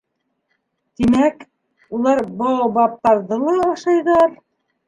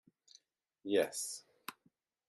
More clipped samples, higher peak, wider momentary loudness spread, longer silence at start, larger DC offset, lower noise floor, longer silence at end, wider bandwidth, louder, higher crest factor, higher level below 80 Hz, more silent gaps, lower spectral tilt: neither; first, -2 dBFS vs -20 dBFS; second, 5 LU vs 17 LU; first, 1 s vs 0.85 s; neither; second, -71 dBFS vs -76 dBFS; about the same, 0.5 s vs 0.55 s; second, 10.5 kHz vs 12.5 kHz; first, -17 LUFS vs -37 LUFS; second, 16 dB vs 22 dB; first, -52 dBFS vs -90 dBFS; neither; first, -6.5 dB/octave vs -2.5 dB/octave